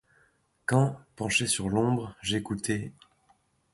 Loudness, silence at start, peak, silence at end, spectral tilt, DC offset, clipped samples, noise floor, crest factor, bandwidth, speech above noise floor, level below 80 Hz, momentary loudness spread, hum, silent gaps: -28 LUFS; 0.7 s; -10 dBFS; 0.8 s; -4.5 dB/octave; under 0.1%; under 0.1%; -68 dBFS; 20 dB; 11.5 kHz; 40 dB; -56 dBFS; 10 LU; none; none